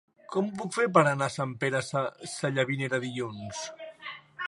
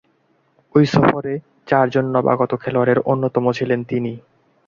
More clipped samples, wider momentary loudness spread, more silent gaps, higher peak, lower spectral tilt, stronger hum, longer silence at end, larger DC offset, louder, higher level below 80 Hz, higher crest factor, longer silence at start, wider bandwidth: neither; first, 17 LU vs 10 LU; neither; second, -6 dBFS vs 0 dBFS; second, -5 dB/octave vs -8 dB/octave; neither; second, 0.05 s vs 0.5 s; neither; second, -29 LUFS vs -18 LUFS; second, -70 dBFS vs -54 dBFS; first, 24 dB vs 18 dB; second, 0.3 s vs 0.75 s; first, 11.5 kHz vs 7.4 kHz